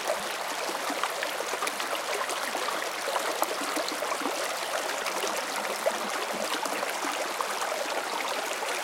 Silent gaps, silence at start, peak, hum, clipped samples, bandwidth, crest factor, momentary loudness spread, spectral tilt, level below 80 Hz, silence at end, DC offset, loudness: none; 0 s; -8 dBFS; none; under 0.1%; 17 kHz; 22 dB; 1 LU; -0.5 dB/octave; -80 dBFS; 0 s; under 0.1%; -30 LUFS